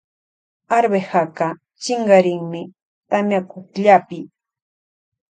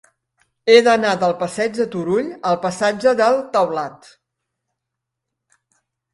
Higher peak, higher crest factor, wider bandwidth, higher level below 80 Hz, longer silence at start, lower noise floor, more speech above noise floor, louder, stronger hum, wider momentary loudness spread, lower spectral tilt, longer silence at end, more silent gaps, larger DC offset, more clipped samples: about the same, 0 dBFS vs 0 dBFS; about the same, 20 dB vs 20 dB; second, 9.2 kHz vs 11.5 kHz; second, -70 dBFS vs -64 dBFS; about the same, 0.7 s vs 0.65 s; first, under -90 dBFS vs -81 dBFS; first, over 73 dB vs 64 dB; about the same, -18 LUFS vs -17 LUFS; neither; first, 18 LU vs 10 LU; about the same, -5.5 dB/octave vs -4.5 dB/octave; second, 1.1 s vs 2.2 s; first, 2.82-3.01 s vs none; neither; neither